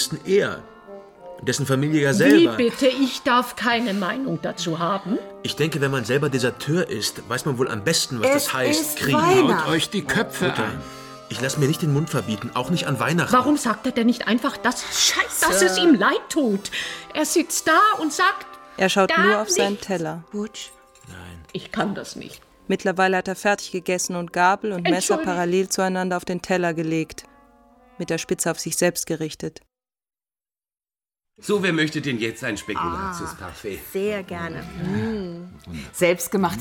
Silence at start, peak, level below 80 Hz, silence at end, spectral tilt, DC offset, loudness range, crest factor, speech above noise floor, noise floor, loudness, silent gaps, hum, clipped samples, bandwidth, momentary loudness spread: 0 s; -4 dBFS; -54 dBFS; 0 s; -4 dB/octave; under 0.1%; 8 LU; 20 dB; over 68 dB; under -90 dBFS; -21 LUFS; none; none; under 0.1%; 19 kHz; 16 LU